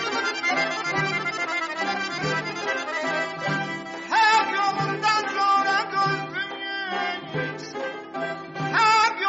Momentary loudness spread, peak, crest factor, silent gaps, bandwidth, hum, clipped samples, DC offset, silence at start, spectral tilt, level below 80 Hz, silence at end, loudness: 12 LU; -8 dBFS; 16 dB; none; 8 kHz; none; under 0.1%; under 0.1%; 0 s; -1.5 dB/octave; -66 dBFS; 0 s; -24 LUFS